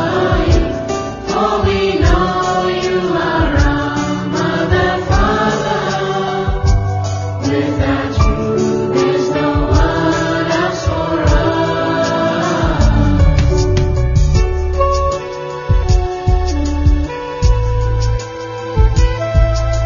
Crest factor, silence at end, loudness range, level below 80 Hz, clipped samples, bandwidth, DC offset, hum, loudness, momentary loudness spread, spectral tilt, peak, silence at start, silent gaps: 14 dB; 0 s; 2 LU; -18 dBFS; under 0.1%; 7.4 kHz; under 0.1%; none; -15 LUFS; 5 LU; -6.5 dB/octave; 0 dBFS; 0 s; none